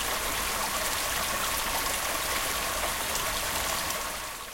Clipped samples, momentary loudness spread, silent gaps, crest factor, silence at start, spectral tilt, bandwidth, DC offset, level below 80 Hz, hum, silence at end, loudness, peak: under 0.1%; 2 LU; none; 16 dB; 0 s; -0.5 dB/octave; 17 kHz; under 0.1%; -44 dBFS; none; 0 s; -28 LUFS; -14 dBFS